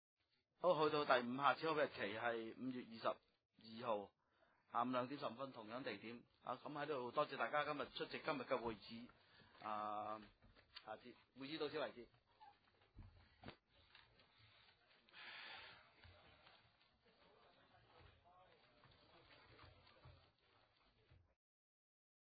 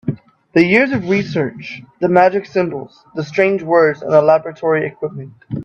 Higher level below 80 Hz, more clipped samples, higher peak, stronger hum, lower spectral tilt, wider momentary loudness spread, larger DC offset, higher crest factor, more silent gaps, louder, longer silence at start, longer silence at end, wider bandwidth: second, -80 dBFS vs -56 dBFS; neither; second, -22 dBFS vs 0 dBFS; neither; second, -2.5 dB/octave vs -7.5 dB/octave; first, 26 LU vs 17 LU; neither; first, 26 dB vs 16 dB; first, 3.45-3.49 s vs none; second, -45 LUFS vs -15 LUFS; first, 0.6 s vs 0.05 s; first, 1.15 s vs 0 s; second, 4.8 kHz vs 8 kHz